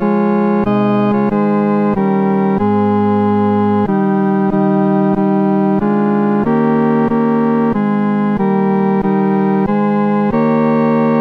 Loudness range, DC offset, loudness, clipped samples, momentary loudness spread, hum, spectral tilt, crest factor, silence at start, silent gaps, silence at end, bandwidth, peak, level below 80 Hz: 1 LU; 0.3%; -14 LUFS; under 0.1%; 1 LU; none; -10.5 dB/octave; 10 dB; 0 s; none; 0 s; 4.6 kHz; -2 dBFS; -44 dBFS